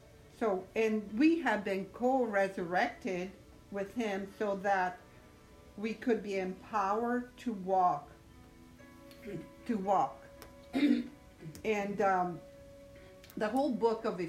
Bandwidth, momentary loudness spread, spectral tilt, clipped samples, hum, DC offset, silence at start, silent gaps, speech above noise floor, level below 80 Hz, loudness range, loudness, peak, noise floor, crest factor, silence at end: 16 kHz; 21 LU; -6 dB/octave; under 0.1%; none; under 0.1%; 0.15 s; none; 24 dB; -64 dBFS; 4 LU; -33 LUFS; -16 dBFS; -57 dBFS; 18 dB; 0 s